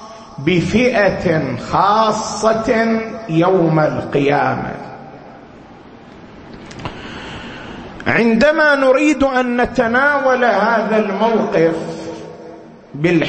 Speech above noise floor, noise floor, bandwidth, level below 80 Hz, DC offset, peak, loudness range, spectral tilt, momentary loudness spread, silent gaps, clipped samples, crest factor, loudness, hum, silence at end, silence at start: 24 dB; -39 dBFS; 8.8 kHz; -44 dBFS; under 0.1%; -2 dBFS; 10 LU; -6 dB/octave; 19 LU; none; under 0.1%; 16 dB; -15 LUFS; none; 0 s; 0 s